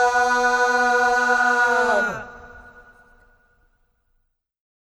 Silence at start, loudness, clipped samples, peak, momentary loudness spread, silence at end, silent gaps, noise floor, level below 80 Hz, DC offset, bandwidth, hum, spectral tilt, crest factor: 0 s; -18 LUFS; under 0.1%; -8 dBFS; 8 LU; 2.4 s; none; -70 dBFS; -54 dBFS; under 0.1%; 13.5 kHz; none; -2 dB/octave; 14 dB